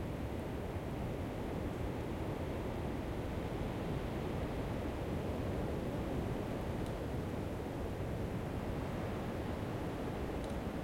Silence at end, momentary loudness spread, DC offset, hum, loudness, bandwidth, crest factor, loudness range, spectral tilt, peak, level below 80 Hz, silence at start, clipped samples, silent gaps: 0 s; 2 LU; under 0.1%; none; -40 LUFS; 16.5 kHz; 12 dB; 1 LU; -7 dB/octave; -26 dBFS; -48 dBFS; 0 s; under 0.1%; none